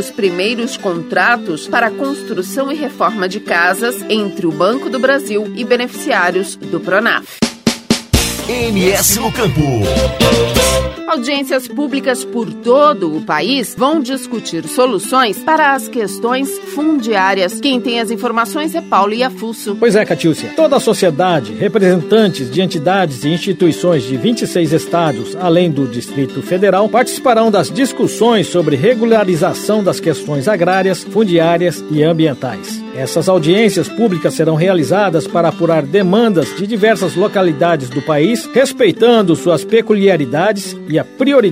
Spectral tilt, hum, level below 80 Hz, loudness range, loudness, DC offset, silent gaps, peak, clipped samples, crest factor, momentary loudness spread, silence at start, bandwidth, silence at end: -4.5 dB/octave; none; -36 dBFS; 3 LU; -14 LUFS; under 0.1%; none; 0 dBFS; under 0.1%; 14 dB; 7 LU; 0 s; 16.5 kHz; 0 s